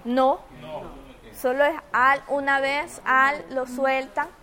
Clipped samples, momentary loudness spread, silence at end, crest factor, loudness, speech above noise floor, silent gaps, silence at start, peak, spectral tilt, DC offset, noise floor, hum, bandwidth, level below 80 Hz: under 0.1%; 18 LU; 0.15 s; 18 dB; -23 LUFS; 20 dB; none; 0.05 s; -6 dBFS; -3.5 dB/octave; under 0.1%; -43 dBFS; none; 17 kHz; -54 dBFS